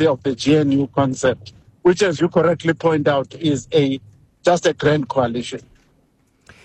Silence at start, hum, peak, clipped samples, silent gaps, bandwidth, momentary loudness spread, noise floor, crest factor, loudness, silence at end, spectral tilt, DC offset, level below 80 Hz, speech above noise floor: 0 s; none; -6 dBFS; under 0.1%; none; 9.2 kHz; 6 LU; -60 dBFS; 12 dB; -18 LUFS; 1.05 s; -6 dB/octave; under 0.1%; -52 dBFS; 42 dB